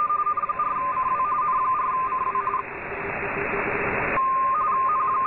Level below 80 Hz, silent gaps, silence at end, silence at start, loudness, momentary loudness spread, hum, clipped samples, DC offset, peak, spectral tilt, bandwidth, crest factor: -50 dBFS; none; 0 s; 0 s; -24 LUFS; 6 LU; none; under 0.1%; under 0.1%; -10 dBFS; -9 dB/octave; 4 kHz; 14 dB